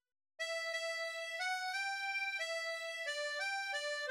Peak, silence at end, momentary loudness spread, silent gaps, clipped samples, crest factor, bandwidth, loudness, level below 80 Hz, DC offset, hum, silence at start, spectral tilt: -28 dBFS; 0 s; 3 LU; none; under 0.1%; 12 dB; 16.5 kHz; -38 LUFS; under -90 dBFS; under 0.1%; none; 0.4 s; 5.5 dB/octave